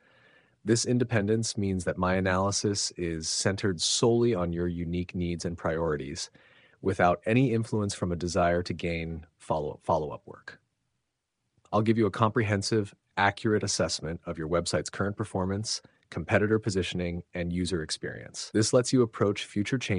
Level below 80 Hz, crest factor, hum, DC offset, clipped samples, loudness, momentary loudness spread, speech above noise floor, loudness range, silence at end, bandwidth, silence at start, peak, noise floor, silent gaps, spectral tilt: -52 dBFS; 22 dB; none; under 0.1%; under 0.1%; -28 LUFS; 10 LU; 53 dB; 4 LU; 0 s; 10.5 kHz; 0.65 s; -8 dBFS; -81 dBFS; none; -4.5 dB/octave